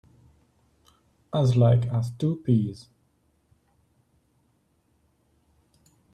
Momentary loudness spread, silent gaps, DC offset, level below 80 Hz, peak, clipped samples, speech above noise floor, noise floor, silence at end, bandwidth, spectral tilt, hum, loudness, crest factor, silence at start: 12 LU; none; under 0.1%; -58 dBFS; -10 dBFS; under 0.1%; 46 dB; -68 dBFS; 3.4 s; 9.2 kHz; -9 dB/octave; none; -24 LUFS; 20 dB; 1.35 s